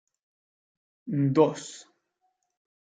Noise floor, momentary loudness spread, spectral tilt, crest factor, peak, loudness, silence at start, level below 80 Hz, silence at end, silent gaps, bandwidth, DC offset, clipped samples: -76 dBFS; 23 LU; -7 dB/octave; 22 dB; -8 dBFS; -25 LUFS; 1.05 s; -78 dBFS; 1.05 s; none; 9.4 kHz; under 0.1%; under 0.1%